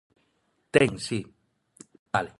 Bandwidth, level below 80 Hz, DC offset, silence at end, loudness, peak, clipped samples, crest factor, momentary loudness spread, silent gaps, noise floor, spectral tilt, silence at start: 11.5 kHz; -58 dBFS; under 0.1%; 0.1 s; -26 LUFS; -4 dBFS; under 0.1%; 26 dB; 11 LU; 1.99-2.06 s; -72 dBFS; -5 dB/octave; 0.75 s